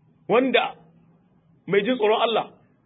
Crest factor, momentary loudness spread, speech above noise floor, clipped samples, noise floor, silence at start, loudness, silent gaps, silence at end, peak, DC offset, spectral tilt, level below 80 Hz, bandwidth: 18 dB; 9 LU; 38 dB; under 0.1%; -59 dBFS; 0.3 s; -22 LUFS; none; 0.4 s; -6 dBFS; under 0.1%; -9.5 dB/octave; -74 dBFS; 4 kHz